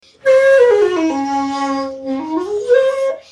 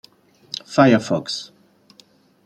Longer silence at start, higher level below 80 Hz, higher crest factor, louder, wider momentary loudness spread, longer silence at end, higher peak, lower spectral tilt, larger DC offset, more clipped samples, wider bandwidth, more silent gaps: second, 0.25 s vs 0.7 s; first, -58 dBFS vs -64 dBFS; second, 14 dB vs 20 dB; first, -15 LUFS vs -18 LUFS; second, 11 LU vs 18 LU; second, 0.15 s vs 1 s; about the same, -2 dBFS vs -2 dBFS; second, -4 dB/octave vs -5.5 dB/octave; neither; neither; about the same, 11.5 kHz vs 11.5 kHz; neither